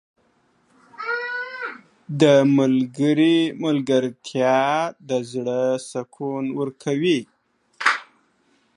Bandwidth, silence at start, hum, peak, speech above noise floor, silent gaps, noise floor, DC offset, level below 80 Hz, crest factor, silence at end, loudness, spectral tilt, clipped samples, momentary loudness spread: 11 kHz; 1 s; none; -2 dBFS; 43 dB; none; -63 dBFS; under 0.1%; -74 dBFS; 20 dB; 0.75 s; -21 LUFS; -5.5 dB/octave; under 0.1%; 13 LU